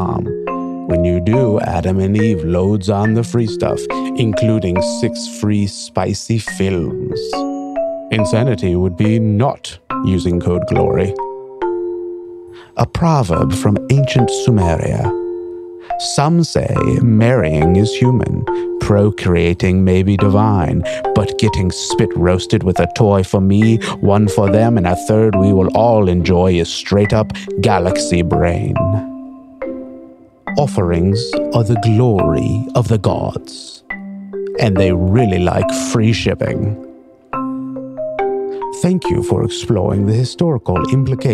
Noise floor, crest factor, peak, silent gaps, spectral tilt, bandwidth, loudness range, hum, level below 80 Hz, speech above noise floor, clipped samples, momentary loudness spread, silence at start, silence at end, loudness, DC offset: -39 dBFS; 14 dB; 0 dBFS; none; -6.5 dB/octave; 12.5 kHz; 5 LU; none; -36 dBFS; 26 dB; under 0.1%; 11 LU; 0 s; 0 s; -15 LUFS; under 0.1%